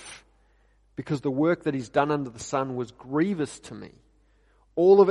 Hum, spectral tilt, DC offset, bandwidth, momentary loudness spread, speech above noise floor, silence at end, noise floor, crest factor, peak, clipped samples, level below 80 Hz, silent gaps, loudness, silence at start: none; -6.5 dB/octave; under 0.1%; 11 kHz; 20 LU; 38 dB; 0 s; -62 dBFS; 20 dB; -6 dBFS; under 0.1%; -62 dBFS; none; -26 LUFS; 0 s